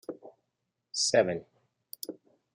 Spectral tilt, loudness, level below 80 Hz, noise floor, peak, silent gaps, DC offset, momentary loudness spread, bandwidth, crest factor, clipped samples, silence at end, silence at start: -2.5 dB/octave; -28 LUFS; -78 dBFS; -83 dBFS; -10 dBFS; none; under 0.1%; 22 LU; 15.5 kHz; 22 dB; under 0.1%; 0.4 s; 0.1 s